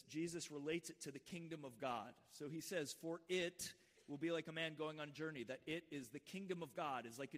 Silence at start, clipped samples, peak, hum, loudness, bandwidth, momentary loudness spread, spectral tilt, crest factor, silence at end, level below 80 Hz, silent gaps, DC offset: 0.05 s; under 0.1%; -30 dBFS; none; -48 LUFS; 15.5 kHz; 9 LU; -4 dB/octave; 18 dB; 0 s; -86 dBFS; none; under 0.1%